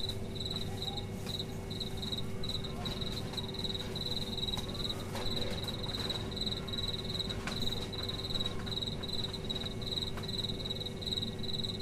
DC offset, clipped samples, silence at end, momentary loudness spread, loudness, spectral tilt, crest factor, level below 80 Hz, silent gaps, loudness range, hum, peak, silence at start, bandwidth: under 0.1%; under 0.1%; 0 s; 3 LU; -36 LUFS; -4.5 dB/octave; 16 dB; -48 dBFS; none; 2 LU; none; -22 dBFS; 0 s; 15.5 kHz